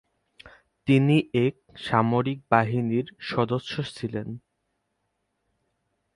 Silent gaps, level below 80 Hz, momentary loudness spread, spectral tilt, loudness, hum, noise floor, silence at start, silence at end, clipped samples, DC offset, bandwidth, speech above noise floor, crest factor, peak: none; -60 dBFS; 13 LU; -7.5 dB/octave; -25 LUFS; none; -77 dBFS; 0.45 s; 1.75 s; under 0.1%; under 0.1%; 11.5 kHz; 53 dB; 24 dB; -4 dBFS